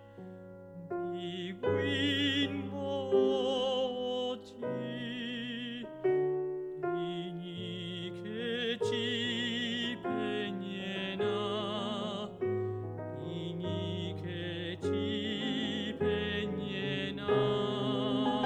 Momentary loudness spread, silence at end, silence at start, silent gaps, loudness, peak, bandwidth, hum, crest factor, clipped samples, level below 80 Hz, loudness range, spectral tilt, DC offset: 10 LU; 0 s; 0 s; none; -34 LUFS; -16 dBFS; 10 kHz; none; 18 dB; under 0.1%; -66 dBFS; 4 LU; -6 dB/octave; under 0.1%